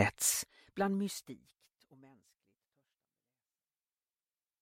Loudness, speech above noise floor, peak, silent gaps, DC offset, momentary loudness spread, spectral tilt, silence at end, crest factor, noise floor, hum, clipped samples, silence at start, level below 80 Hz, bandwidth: -35 LUFS; over 52 dB; -12 dBFS; none; under 0.1%; 20 LU; -3 dB/octave; 3.25 s; 28 dB; under -90 dBFS; none; under 0.1%; 0 s; -74 dBFS; 16 kHz